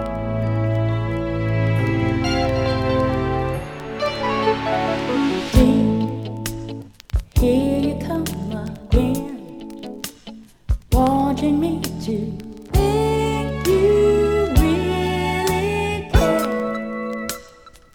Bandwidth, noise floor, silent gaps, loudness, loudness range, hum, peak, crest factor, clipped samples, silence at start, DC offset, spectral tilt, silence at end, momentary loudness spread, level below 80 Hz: over 20 kHz; -46 dBFS; none; -20 LUFS; 4 LU; none; -2 dBFS; 18 dB; under 0.1%; 0 s; under 0.1%; -6.5 dB/octave; 0.25 s; 14 LU; -28 dBFS